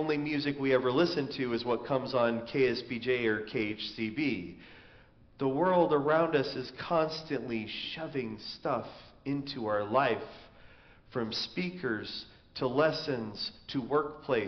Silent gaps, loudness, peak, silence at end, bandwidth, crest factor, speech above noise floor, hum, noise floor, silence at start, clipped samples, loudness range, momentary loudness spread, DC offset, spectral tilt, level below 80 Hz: none; -32 LUFS; -14 dBFS; 0 s; 6.4 kHz; 18 dB; 27 dB; none; -58 dBFS; 0 s; under 0.1%; 4 LU; 11 LU; under 0.1%; -4 dB/octave; -64 dBFS